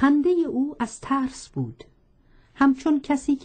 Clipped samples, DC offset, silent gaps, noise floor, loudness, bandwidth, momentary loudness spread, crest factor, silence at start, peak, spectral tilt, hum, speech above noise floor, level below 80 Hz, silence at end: under 0.1%; under 0.1%; none; -57 dBFS; -24 LUFS; 9.2 kHz; 12 LU; 16 dB; 0 s; -8 dBFS; -6 dB/octave; none; 34 dB; -54 dBFS; 0 s